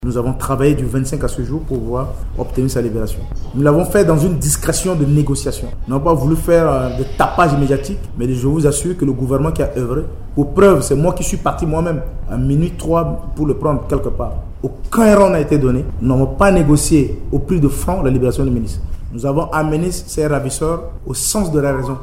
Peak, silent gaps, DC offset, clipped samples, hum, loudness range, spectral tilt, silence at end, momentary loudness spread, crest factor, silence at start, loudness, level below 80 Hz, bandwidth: 0 dBFS; none; under 0.1%; under 0.1%; none; 5 LU; -6.5 dB/octave; 0 s; 11 LU; 14 dB; 0 s; -16 LUFS; -24 dBFS; 16.5 kHz